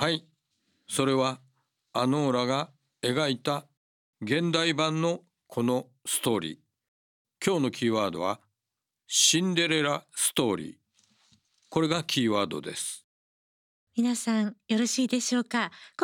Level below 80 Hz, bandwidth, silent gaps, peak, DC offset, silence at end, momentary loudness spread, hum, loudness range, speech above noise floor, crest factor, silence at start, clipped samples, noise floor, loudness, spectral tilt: -74 dBFS; 19 kHz; 3.77-4.13 s, 6.88-7.25 s, 13.04-13.87 s; -8 dBFS; under 0.1%; 0 s; 10 LU; none; 4 LU; 60 dB; 22 dB; 0 s; under 0.1%; -87 dBFS; -27 LUFS; -3.5 dB/octave